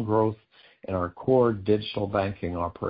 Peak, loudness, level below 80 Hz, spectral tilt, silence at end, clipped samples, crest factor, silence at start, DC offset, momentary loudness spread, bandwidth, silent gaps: -10 dBFS; -26 LUFS; -48 dBFS; -11.5 dB/octave; 0 s; under 0.1%; 16 dB; 0 s; under 0.1%; 10 LU; 5.2 kHz; none